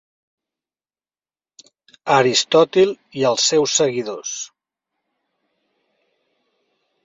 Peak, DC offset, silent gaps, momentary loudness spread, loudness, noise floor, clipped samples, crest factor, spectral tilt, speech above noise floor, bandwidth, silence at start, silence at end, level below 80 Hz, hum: -2 dBFS; under 0.1%; none; 14 LU; -17 LUFS; under -90 dBFS; under 0.1%; 20 dB; -3 dB/octave; over 73 dB; 8 kHz; 2.05 s; 2.6 s; -66 dBFS; none